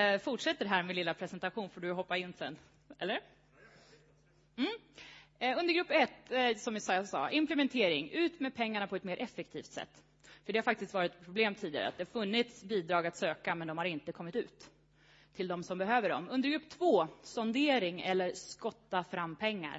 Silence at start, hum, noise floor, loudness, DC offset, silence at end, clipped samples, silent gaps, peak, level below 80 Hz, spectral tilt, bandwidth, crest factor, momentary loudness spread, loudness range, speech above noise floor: 0 s; none; -67 dBFS; -35 LUFS; under 0.1%; 0 s; under 0.1%; none; -14 dBFS; -76 dBFS; -2.5 dB/octave; 7.6 kHz; 22 dB; 12 LU; 7 LU; 33 dB